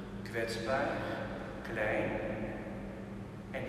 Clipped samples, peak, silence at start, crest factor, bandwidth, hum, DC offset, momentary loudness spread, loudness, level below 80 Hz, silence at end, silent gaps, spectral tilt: under 0.1%; -20 dBFS; 0 s; 16 dB; 14 kHz; none; under 0.1%; 11 LU; -37 LUFS; -54 dBFS; 0 s; none; -6 dB/octave